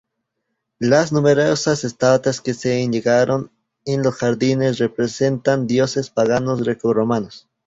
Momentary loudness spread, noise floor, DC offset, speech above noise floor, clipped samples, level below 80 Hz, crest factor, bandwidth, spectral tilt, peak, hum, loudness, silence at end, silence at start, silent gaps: 7 LU; -76 dBFS; under 0.1%; 58 dB; under 0.1%; -56 dBFS; 16 dB; 8 kHz; -5.5 dB/octave; -2 dBFS; none; -18 LUFS; 0.3 s; 0.8 s; none